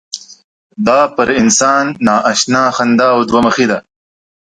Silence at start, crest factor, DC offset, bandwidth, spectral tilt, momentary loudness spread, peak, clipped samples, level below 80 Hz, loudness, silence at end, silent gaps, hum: 0.15 s; 12 dB; under 0.1%; 9.6 kHz; -3.5 dB/octave; 7 LU; 0 dBFS; under 0.1%; -48 dBFS; -11 LUFS; 0.7 s; 0.44-0.70 s; none